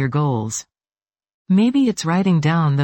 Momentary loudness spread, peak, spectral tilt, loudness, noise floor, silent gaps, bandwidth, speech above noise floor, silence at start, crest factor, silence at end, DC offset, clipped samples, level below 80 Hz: 8 LU; -6 dBFS; -6.5 dB/octave; -18 LUFS; under -90 dBFS; 1.34-1.45 s; 17 kHz; over 73 dB; 0 s; 12 dB; 0 s; under 0.1%; under 0.1%; -58 dBFS